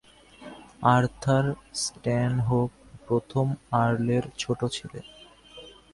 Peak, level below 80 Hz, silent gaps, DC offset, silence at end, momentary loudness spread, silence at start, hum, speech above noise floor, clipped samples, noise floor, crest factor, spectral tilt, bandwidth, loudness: -6 dBFS; -54 dBFS; none; under 0.1%; 0.25 s; 23 LU; 0.4 s; none; 23 dB; under 0.1%; -48 dBFS; 22 dB; -6 dB/octave; 11.5 kHz; -26 LUFS